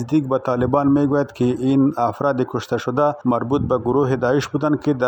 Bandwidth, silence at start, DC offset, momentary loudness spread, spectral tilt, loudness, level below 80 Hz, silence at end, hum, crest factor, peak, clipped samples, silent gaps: 8.6 kHz; 0 s; under 0.1%; 4 LU; -8 dB/octave; -19 LUFS; -48 dBFS; 0 s; none; 18 dB; 0 dBFS; under 0.1%; none